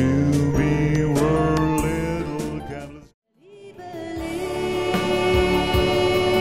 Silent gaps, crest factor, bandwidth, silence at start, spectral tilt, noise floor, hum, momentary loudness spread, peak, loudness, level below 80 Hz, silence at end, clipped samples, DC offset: 3.14-3.22 s; 16 dB; 16 kHz; 0 s; -6 dB/octave; -45 dBFS; none; 14 LU; -6 dBFS; -21 LUFS; -36 dBFS; 0 s; under 0.1%; 0.5%